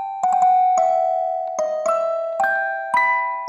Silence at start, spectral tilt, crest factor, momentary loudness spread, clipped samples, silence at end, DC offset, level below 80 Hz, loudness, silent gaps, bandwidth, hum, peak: 0 s; -1.5 dB/octave; 12 dB; 7 LU; under 0.1%; 0 s; under 0.1%; -74 dBFS; -19 LUFS; none; 11.5 kHz; none; -6 dBFS